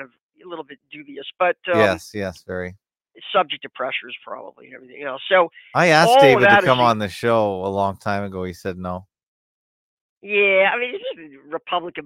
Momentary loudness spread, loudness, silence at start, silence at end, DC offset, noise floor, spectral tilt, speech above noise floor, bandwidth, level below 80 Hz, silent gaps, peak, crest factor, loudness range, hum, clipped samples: 23 LU; -18 LUFS; 0 s; 0 s; under 0.1%; -42 dBFS; -5 dB/octave; 22 dB; 16.5 kHz; -60 dBFS; 0.22-0.29 s, 9.23-10.21 s; 0 dBFS; 20 dB; 9 LU; none; under 0.1%